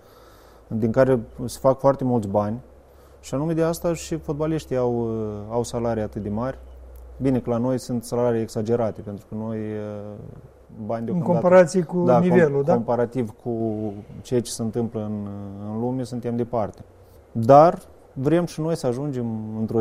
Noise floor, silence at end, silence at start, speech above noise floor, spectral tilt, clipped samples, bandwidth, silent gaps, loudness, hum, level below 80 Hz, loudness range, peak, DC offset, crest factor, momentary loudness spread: -49 dBFS; 0 s; 0.7 s; 27 dB; -7 dB/octave; under 0.1%; 15.5 kHz; none; -23 LUFS; none; -48 dBFS; 7 LU; 0 dBFS; under 0.1%; 22 dB; 16 LU